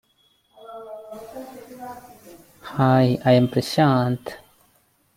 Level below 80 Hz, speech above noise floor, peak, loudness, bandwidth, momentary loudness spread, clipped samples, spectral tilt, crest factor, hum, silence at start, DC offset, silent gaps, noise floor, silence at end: -58 dBFS; 42 dB; -4 dBFS; -20 LUFS; 16 kHz; 23 LU; under 0.1%; -7 dB/octave; 20 dB; none; 0.7 s; under 0.1%; none; -63 dBFS; 0.8 s